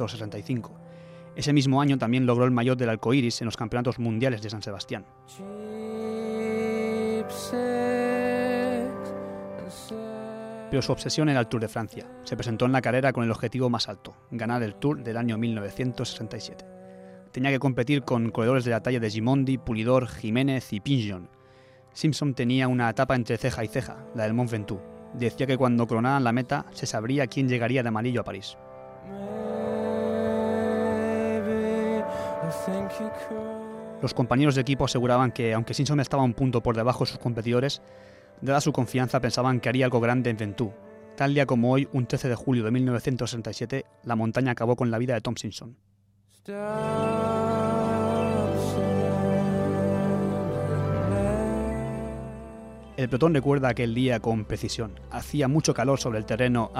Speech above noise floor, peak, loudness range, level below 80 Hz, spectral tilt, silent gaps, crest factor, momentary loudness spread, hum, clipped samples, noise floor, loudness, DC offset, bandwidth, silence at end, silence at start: 36 dB; -8 dBFS; 4 LU; -50 dBFS; -6.5 dB/octave; none; 18 dB; 13 LU; none; under 0.1%; -62 dBFS; -26 LUFS; under 0.1%; 15 kHz; 0 s; 0 s